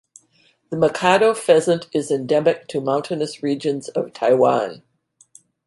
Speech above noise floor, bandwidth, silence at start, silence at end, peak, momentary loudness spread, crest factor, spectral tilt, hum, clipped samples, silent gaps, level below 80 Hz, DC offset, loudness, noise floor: 41 dB; 11.5 kHz; 0.7 s; 0.9 s; -2 dBFS; 9 LU; 18 dB; -5 dB/octave; none; under 0.1%; none; -66 dBFS; under 0.1%; -19 LUFS; -60 dBFS